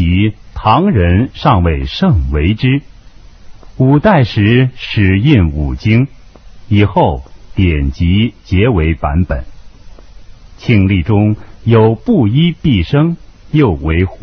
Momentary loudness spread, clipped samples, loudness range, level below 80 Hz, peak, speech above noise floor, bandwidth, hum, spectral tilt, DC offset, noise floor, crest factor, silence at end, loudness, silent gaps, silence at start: 7 LU; under 0.1%; 3 LU; -22 dBFS; 0 dBFS; 26 dB; 6.4 kHz; none; -9 dB/octave; under 0.1%; -36 dBFS; 12 dB; 0.05 s; -12 LUFS; none; 0 s